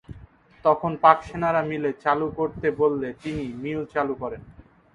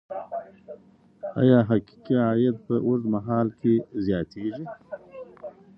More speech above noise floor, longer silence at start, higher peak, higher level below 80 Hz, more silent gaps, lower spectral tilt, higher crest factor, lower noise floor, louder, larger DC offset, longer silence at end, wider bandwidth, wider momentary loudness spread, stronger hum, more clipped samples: about the same, 26 dB vs 29 dB; about the same, 0.1 s vs 0.1 s; first, -2 dBFS vs -6 dBFS; first, -52 dBFS vs -58 dBFS; neither; second, -7.5 dB/octave vs -10.5 dB/octave; about the same, 24 dB vs 20 dB; about the same, -49 dBFS vs -52 dBFS; about the same, -24 LUFS vs -24 LUFS; neither; about the same, 0.35 s vs 0.3 s; first, 10 kHz vs 5.8 kHz; second, 13 LU vs 21 LU; neither; neither